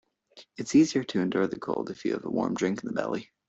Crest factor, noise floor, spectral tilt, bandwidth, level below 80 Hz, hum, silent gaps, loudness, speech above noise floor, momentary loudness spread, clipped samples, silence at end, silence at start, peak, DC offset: 18 dB; -56 dBFS; -5.5 dB/octave; 8.2 kHz; -66 dBFS; none; none; -28 LUFS; 29 dB; 10 LU; under 0.1%; 0.25 s; 0.35 s; -10 dBFS; under 0.1%